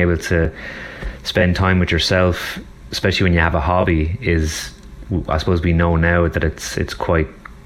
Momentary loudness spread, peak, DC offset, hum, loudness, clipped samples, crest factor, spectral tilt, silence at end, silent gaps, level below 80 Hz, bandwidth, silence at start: 12 LU; -2 dBFS; under 0.1%; none; -18 LUFS; under 0.1%; 16 dB; -5.5 dB/octave; 0.05 s; none; -28 dBFS; 14.5 kHz; 0 s